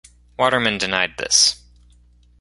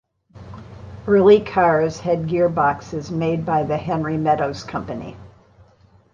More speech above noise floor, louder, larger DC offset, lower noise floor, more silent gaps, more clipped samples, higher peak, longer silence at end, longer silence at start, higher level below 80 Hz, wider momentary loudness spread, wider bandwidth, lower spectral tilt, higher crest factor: about the same, 34 dB vs 35 dB; about the same, -17 LUFS vs -19 LUFS; neither; about the same, -52 dBFS vs -53 dBFS; neither; neither; about the same, 0 dBFS vs -2 dBFS; about the same, 0.85 s vs 0.85 s; about the same, 0.4 s vs 0.35 s; about the same, -50 dBFS vs -48 dBFS; second, 7 LU vs 23 LU; first, 11.5 kHz vs 7.4 kHz; second, -1 dB/octave vs -7.5 dB/octave; about the same, 22 dB vs 18 dB